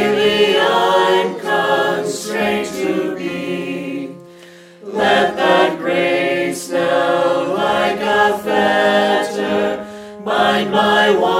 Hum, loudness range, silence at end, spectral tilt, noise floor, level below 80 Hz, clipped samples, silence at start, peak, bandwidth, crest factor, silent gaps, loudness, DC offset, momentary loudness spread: none; 4 LU; 0 s; -4 dB/octave; -41 dBFS; -56 dBFS; under 0.1%; 0 s; -2 dBFS; 16.5 kHz; 14 dB; none; -16 LUFS; under 0.1%; 10 LU